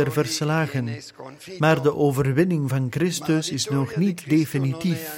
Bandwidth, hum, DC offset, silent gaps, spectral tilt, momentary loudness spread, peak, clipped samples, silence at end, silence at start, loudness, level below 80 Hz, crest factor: 17 kHz; none; under 0.1%; none; -5.5 dB/octave; 9 LU; -4 dBFS; under 0.1%; 0 s; 0 s; -23 LUFS; -56 dBFS; 18 dB